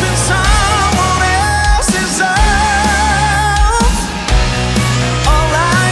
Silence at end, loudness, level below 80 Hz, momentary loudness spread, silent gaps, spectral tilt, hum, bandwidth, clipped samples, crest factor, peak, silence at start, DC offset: 0 s; -12 LUFS; -16 dBFS; 3 LU; none; -3.5 dB/octave; none; 12 kHz; under 0.1%; 10 dB; 0 dBFS; 0 s; under 0.1%